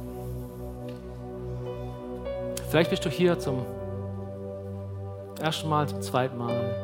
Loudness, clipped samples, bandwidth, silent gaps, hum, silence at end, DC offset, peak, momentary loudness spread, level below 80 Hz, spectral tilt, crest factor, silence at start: -30 LUFS; under 0.1%; 16.5 kHz; none; none; 0 s; under 0.1%; -6 dBFS; 13 LU; -48 dBFS; -6 dB/octave; 24 dB; 0 s